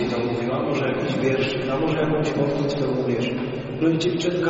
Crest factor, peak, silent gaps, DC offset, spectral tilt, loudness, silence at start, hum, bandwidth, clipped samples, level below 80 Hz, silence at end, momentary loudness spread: 14 dB; -8 dBFS; none; under 0.1%; -5.5 dB/octave; -23 LUFS; 0 s; none; 8 kHz; under 0.1%; -50 dBFS; 0 s; 3 LU